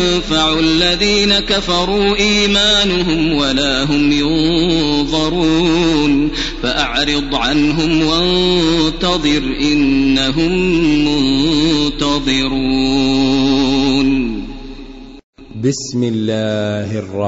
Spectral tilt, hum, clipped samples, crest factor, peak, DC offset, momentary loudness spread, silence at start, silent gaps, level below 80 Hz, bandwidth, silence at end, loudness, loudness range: -4.5 dB/octave; none; under 0.1%; 12 dB; -2 dBFS; under 0.1%; 6 LU; 0 s; 15.24-15.33 s; -28 dBFS; 8 kHz; 0 s; -14 LUFS; 4 LU